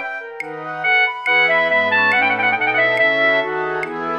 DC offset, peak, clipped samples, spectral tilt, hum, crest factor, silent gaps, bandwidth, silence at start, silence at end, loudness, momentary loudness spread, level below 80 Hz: under 0.1%; -6 dBFS; under 0.1%; -4.5 dB/octave; none; 12 dB; none; 9.8 kHz; 0 s; 0 s; -15 LUFS; 13 LU; -70 dBFS